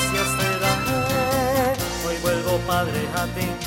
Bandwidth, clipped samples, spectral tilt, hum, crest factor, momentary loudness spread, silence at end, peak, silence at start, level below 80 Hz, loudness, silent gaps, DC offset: 16.5 kHz; under 0.1%; -4 dB/octave; none; 16 dB; 4 LU; 0 s; -6 dBFS; 0 s; -40 dBFS; -22 LUFS; none; under 0.1%